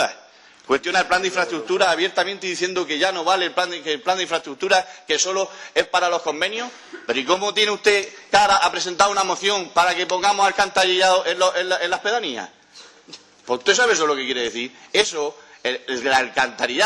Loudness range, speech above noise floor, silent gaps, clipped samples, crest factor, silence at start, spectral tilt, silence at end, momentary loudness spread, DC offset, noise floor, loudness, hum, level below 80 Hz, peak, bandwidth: 4 LU; 28 dB; none; under 0.1%; 18 dB; 0 s; -1 dB/octave; 0 s; 9 LU; under 0.1%; -48 dBFS; -20 LUFS; none; -60 dBFS; -4 dBFS; 12 kHz